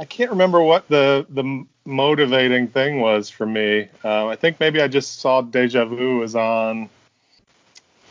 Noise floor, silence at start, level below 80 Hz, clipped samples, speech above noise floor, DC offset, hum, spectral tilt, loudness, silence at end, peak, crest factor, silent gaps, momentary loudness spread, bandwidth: -60 dBFS; 0 s; -70 dBFS; under 0.1%; 42 dB; under 0.1%; none; -5 dB/octave; -18 LUFS; 1.25 s; -2 dBFS; 16 dB; none; 9 LU; 7.6 kHz